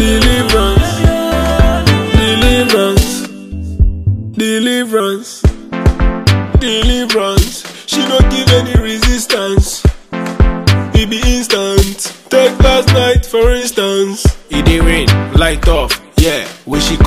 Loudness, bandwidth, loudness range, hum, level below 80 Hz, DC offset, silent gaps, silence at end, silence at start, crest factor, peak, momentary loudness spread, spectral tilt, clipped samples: -12 LUFS; 16 kHz; 3 LU; none; -16 dBFS; under 0.1%; none; 0 s; 0 s; 10 dB; 0 dBFS; 7 LU; -5 dB/octave; 0.1%